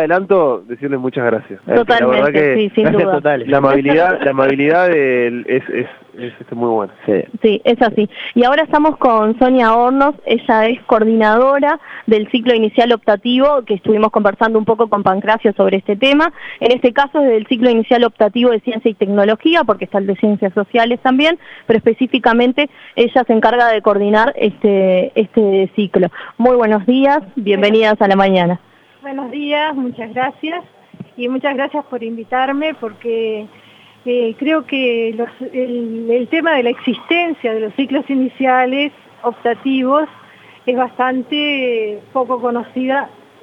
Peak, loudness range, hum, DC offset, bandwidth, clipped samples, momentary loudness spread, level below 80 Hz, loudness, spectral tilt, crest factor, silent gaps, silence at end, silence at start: 0 dBFS; 6 LU; none; under 0.1%; 6.6 kHz; under 0.1%; 9 LU; -52 dBFS; -14 LUFS; -7.5 dB/octave; 14 dB; none; 0.35 s; 0 s